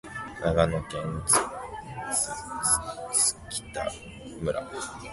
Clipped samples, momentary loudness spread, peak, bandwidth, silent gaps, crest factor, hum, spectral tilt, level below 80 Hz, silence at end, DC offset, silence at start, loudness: under 0.1%; 14 LU; -6 dBFS; 12 kHz; none; 22 dB; none; -3 dB/octave; -46 dBFS; 0 s; under 0.1%; 0.05 s; -27 LUFS